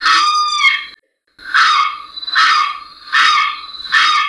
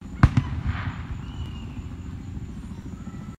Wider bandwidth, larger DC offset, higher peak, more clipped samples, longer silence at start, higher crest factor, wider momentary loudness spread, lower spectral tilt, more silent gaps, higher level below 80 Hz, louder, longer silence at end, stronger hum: first, 11 kHz vs 9.4 kHz; neither; first, 0 dBFS vs -4 dBFS; neither; about the same, 0 s vs 0 s; second, 14 dB vs 24 dB; second, 12 LU vs 16 LU; second, 3 dB/octave vs -7.5 dB/octave; neither; second, -60 dBFS vs -34 dBFS; first, -12 LUFS vs -30 LUFS; about the same, 0 s vs 0.05 s; neither